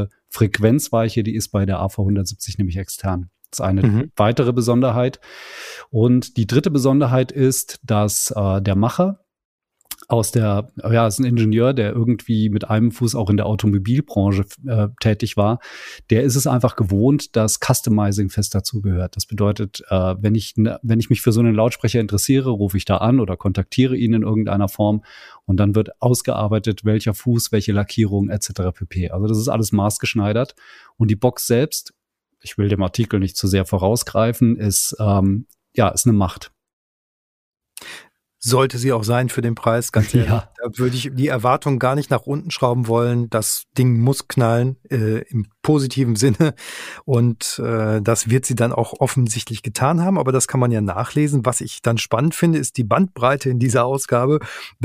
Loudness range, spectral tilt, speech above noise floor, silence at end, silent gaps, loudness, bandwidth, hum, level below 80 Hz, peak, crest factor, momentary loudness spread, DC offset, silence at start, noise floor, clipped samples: 3 LU; -6 dB/octave; 25 dB; 0 s; 9.45-9.58 s, 36.73-37.52 s; -19 LUFS; 15.5 kHz; none; -46 dBFS; 0 dBFS; 18 dB; 7 LU; under 0.1%; 0 s; -43 dBFS; under 0.1%